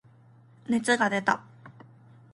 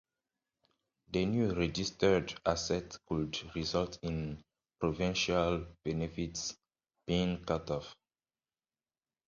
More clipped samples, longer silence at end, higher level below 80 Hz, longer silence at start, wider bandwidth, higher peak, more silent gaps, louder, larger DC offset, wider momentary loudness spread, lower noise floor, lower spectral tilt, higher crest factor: neither; second, 0.6 s vs 1.35 s; second, -74 dBFS vs -52 dBFS; second, 0.7 s vs 1.1 s; first, 11.5 kHz vs 7.6 kHz; first, -8 dBFS vs -12 dBFS; neither; first, -26 LUFS vs -35 LUFS; neither; about the same, 9 LU vs 9 LU; second, -56 dBFS vs under -90 dBFS; about the same, -4 dB/octave vs -5 dB/octave; about the same, 22 dB vs 24 dB